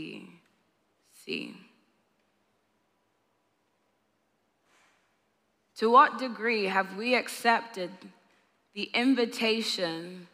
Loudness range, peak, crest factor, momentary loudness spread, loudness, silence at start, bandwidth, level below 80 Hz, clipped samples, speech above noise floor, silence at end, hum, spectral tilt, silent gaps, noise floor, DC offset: 18 LU; -8 dBFS; 22 dB; 19 LU; -27 LUFS; 0 s; 15.5 kHz; under -90 dBFS; under 0.1%; 47 dB; 0.1 s; none; -3.5 dB/octave; none; -74 dBFS; under 0.1%